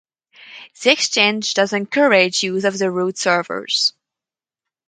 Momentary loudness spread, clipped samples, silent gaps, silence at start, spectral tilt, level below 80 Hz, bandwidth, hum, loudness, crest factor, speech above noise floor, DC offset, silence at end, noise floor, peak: 6 LU; under 0.1%; none; 0.4 s; -2.5 dB/octave; -70 dBFS; 9.6 kHz; none; -17 LUFS; 20 dB; 72 dB; under 0.1%; 1 s; -90 dBFS; 0 dBFS